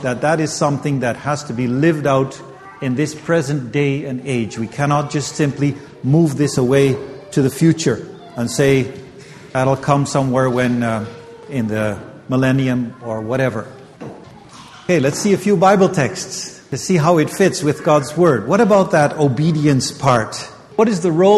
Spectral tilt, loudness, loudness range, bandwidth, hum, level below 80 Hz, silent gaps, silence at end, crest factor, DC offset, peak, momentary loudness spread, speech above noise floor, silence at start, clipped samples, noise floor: -6 dB/octave; -17 LUFS; 5 LU; 13 kHz; none; -50 dBFS; none; 0 s; 16 dB; under 0.1%; 0 dBFS; 12 LU; 23 dB; 0 s; under 0.1%; -39 dBFS